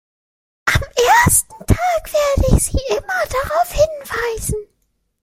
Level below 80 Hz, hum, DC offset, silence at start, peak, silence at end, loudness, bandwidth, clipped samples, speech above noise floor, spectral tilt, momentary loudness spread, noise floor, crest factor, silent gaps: -26 dBFS; none; under 0.1%; 0.65 s; 0 dBFS; 0.6 s; -17 LUFS; 16.5 kHz; under 0.1%; 49 dB; -4 dB/octave; 10 LU; -67 dBFS; 18 dB; none